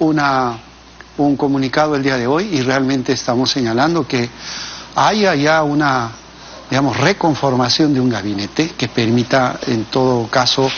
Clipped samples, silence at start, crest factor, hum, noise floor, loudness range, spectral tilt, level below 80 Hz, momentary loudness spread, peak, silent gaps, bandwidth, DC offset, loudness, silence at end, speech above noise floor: under 0.1%; 0 s; 16 dB; none; -40 dBFS; 1 LU; -4 dB/octave; -46 dBFS; 9 LU; 0 dBFS; none; 7.2 kHz; under 0.1%; -16 LUFS; 0 s; 24 dB